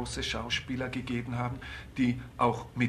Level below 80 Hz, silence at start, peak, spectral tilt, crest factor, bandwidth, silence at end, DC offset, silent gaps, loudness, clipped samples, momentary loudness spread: -48 dBFS; 0 s; -14 dBFS; -5 dB/octave; 18 dB; 12.5 kHz; 0 s; under 0.1%; none; -32 LUFS; under 0.1%; 6 LU